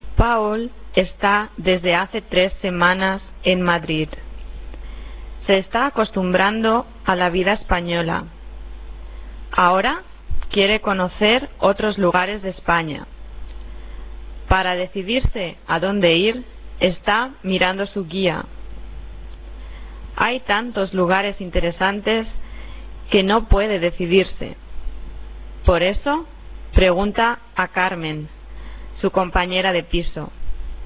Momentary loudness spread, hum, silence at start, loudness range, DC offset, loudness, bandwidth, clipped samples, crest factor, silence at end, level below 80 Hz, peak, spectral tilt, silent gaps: 21 LU; none; 0.05 s; 4 LU; under 0.1%; -19 LUFS; 4 kHz; under 0.1%; 18 dB; 0 s; -30 dBFS; -2 dBFS; -9 dB/octave; none